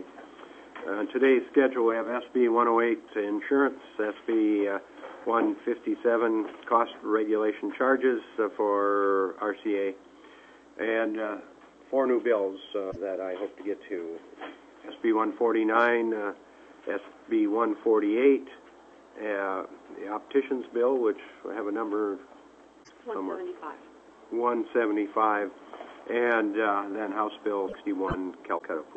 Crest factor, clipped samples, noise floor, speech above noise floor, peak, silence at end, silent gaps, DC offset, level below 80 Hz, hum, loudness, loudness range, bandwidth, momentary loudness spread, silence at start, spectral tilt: 20 dB; under 0.1%; -54 dBFS; 27 dB; -8 dBFS; 0 s; none; under 0.1%; -64 dBFS; none; -28 LUFS; 5 LU; 7.8 kHz; 17 LU; 0 s; -6.5 dB/octave